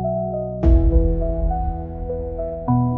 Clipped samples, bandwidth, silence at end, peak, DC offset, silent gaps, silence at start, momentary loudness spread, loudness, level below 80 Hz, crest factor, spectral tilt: under 0.1%; 2.5 kHz; 0 s; -4 dBFS; under 0.1%; none; 0 s; 11 LU; -22 LUFS; -22 dBFS; 14 dB; -12.5 dB/octave